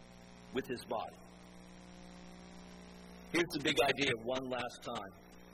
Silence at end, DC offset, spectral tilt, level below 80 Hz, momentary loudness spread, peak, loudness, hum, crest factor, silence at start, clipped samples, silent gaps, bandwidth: 0 s; under 0.1%; -4 dB/octave; -64 dBFS; 24 LU; -18 dBFS; -36 LUFS; 60 Hz at -55 dBFS; 22 dB; 0 s; under 0.1%; none; 15.5 kHz